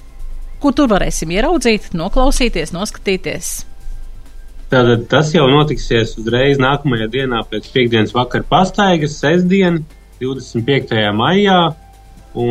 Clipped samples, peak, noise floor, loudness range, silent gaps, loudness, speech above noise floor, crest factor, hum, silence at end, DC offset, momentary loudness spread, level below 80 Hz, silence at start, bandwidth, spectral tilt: under 0.1%; 0 dBFS; -39 dBFS; 4 LU; none; -15 LUFS; 25 dB; 14 dB; none; 0 s; under 0.1%; 10 LU; -26 dBFS; 0 s; 14 kHz; -5 dB/octave